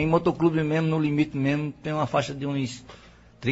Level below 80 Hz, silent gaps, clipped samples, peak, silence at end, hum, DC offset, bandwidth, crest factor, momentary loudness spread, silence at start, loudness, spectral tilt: -52 dBFS; none; under 0.1%; -8 dBFS; 0 s; none; under 0.1%; 8 kHz; 18 dB; 8 LU; 0 s; -25 LUFS; -7 dB/octave